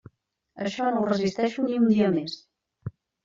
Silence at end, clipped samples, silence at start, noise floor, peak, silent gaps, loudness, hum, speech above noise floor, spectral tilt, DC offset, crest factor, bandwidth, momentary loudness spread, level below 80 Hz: 0.35 s; under 0.1%; 0.55 s; -62 dBFS; -10 dBFS; none; -25 LUFS; none; 38 dB; -6.5 dB/octave; under 0.1%; 16 dB; 7.6 kHz; 20 LU; -66 dBFS